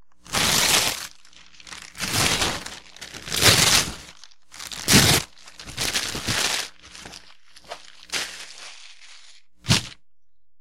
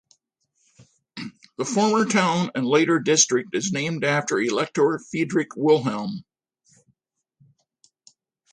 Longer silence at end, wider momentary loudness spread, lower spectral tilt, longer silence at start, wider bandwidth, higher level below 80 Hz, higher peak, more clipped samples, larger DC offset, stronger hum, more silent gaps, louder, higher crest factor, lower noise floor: second, 0 s vs 2.3 s; first, 25 LU vs 17 LU; second, -2 dB/octave vs -4 dB/octave; second, 0 s vs 1.15 s; first, 16.5 kHz vs 10.5 kHz; first, -44 dBFS vs -70 dBFS; first, 0 dBFS vs -4 dBFS; neither; neither; neither; neither; about the same, -20 LUFS vs -22 LUFS; about the same, 24 dB vs 20 dB; first, -78 dBFS vs -74 dBFS